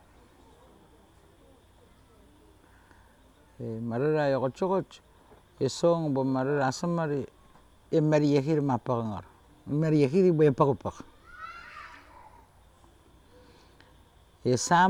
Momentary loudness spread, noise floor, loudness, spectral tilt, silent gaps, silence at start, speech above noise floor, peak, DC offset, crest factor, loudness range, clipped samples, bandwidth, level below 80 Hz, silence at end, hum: 21 LU; -59 dBFS; -27 LUFS; -6.5 dB/octave; none; 3.6 s; 33 dB; -8 dBFS; under 0.1%; 20 dB; 16 LU; under 0.1%; 12 kHz; -62 dBFS; 0 s; none